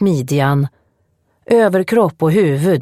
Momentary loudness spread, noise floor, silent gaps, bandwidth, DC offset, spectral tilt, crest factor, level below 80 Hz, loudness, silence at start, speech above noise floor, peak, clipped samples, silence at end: 4 LU; -62 dBFS; none; 15 kHz; under 0.1%; -7.5 dB/octave; 14 dB; -58 dBFS; -15 LUFS; 0 s; 48 dB; 0 dBFS; under 0.1%; 0 s